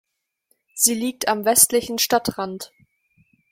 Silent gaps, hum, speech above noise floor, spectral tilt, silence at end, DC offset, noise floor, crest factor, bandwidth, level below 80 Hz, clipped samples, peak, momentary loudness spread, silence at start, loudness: none; none; 49 dB; -1.5 dB/octave; 0.85 s; under 0.1%; -69 dBFS; 22 dB; 16.5 kHz; -58 dBFS; under 0.1%; 0 dBFS; 20 LU; 0.75 s; -19 LUFS